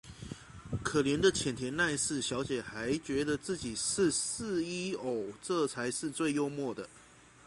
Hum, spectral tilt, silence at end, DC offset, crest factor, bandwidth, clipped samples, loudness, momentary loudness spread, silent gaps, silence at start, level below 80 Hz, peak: none; -3.5 dB/octave; 0.25 s; under 0.1%; 20 dB; 11.5 kHz; under 0.1%; -33 LUFS; 11 LU; none; 0.05 s; -58 dBFS; -14 dBFS